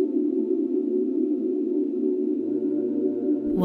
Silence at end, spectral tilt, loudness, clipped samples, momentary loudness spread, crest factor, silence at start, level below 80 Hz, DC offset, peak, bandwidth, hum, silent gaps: 0 s; -11.5 dB/octave; -25 LUFS; under 0.1%; 1 LU; 14 dB; 0 s; -62 dBFS; under 0.1%; -10 dBFS; 1.6 kHz; none; none